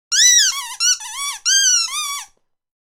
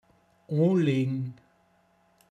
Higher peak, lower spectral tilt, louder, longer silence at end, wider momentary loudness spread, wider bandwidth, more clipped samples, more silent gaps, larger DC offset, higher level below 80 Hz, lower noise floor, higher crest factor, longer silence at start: first, -2 dBFS vs -14 dBFS; second, 8.5 dB/octave vs -9 dB/octave; first, -14 LUFS vs -27 LUFS; second, 0.6 s vs 1 s; first, 14 LU vs 11 LU; first, 19 kHz vs 8.8 kHz; neither; neither; neither; first, -64 dBFS vs -76 dBFS; second, -47 dBFS vs -66 dBFS; about the same, 16 dB vs 16 dB; second, 0.1 s vs 0.5 s